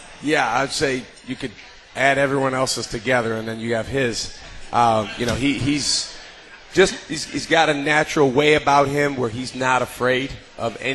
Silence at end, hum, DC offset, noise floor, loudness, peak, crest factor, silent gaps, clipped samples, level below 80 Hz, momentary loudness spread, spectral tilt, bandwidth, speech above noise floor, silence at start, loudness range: 0 s; none; under 0.1%; -42 dBFS; -20 LUFS; -2 dBFS; 18 dB; none; under 0.1%; -46 dBFS; 14 LU; -4 dB/octave; 12 kHz; 22 dB; 0 s; 3 LU